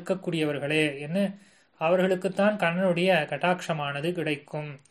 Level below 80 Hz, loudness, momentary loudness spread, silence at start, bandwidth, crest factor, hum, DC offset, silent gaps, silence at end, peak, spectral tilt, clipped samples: -70 dBFS; -26 LUFS; 7 LU; 0 s; 13 kHz; 18 dB; none; under 0.1%; none; 0.15 s; -10 dBFS; -6 dB/octave; under 0.1%